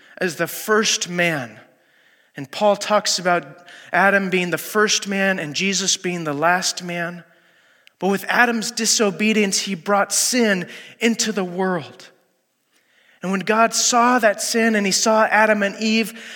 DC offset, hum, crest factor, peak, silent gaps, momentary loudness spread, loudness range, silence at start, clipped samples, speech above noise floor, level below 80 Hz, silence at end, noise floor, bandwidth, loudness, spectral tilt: under 0.1%; none; 18 dB; -2 dBFS; none; 10 LU; 4 LU; 0.2 s; under 0.1%; 47 dB; -80 dBFS; 0 s; -66 dBFS; 17.5 kHz; -18 LUFS; -2.5 dB/octave